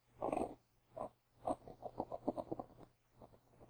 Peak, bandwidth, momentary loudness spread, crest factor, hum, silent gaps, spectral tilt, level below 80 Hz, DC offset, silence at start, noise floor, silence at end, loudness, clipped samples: -24 dBFS; over 20 kHz; 22 LU; 24 dB; none; none; -7 dB/octave; -68 dBFS; under 0.1%; 0.15 s; -65 dBFS; 0 s; -46 LUFS; under 0.1%